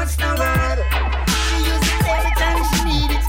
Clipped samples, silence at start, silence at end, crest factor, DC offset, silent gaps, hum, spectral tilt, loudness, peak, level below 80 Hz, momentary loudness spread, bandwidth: under 0.1%; 0 s; 0 s; 10 dB; under 0.1%; none; none; -4 dB/octave; -18 LUFS; -8 dBFS; -20 dBFS; 2 LU; 16.5 kHz